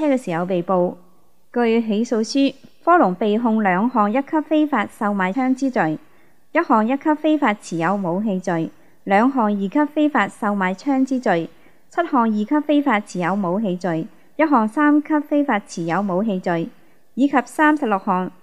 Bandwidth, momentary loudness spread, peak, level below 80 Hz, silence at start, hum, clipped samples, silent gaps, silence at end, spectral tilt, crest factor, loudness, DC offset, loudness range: 11.5 kHz; 7 LU; -2 dBFS; -68 dBFS; 0 s; none; under 0.1%; none; 0.15 s; -6.5 dB/octave; 16 dB; -19 LUFS; 0.5%; 2 LU